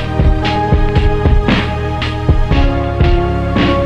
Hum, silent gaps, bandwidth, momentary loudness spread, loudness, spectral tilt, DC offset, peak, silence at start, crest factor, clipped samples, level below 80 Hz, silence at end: none; none; 8 kHz; 3 LU; -14 LUFS; -7.5 dB/octave; under 0.1%; 0 dBFS; 0 s; 12 dB; under 0.1%; -16 dBFS; 0 s